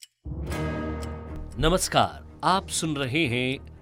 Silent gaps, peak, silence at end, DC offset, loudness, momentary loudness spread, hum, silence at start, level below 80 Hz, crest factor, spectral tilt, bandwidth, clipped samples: none; -4 dBFS; 0 s; under 0.1%; -26 LUFS; 14 LU; none; 0 s; -40 dBFS; 22 dB; -4 dB/octave; 16.5 kHz; under 0.1%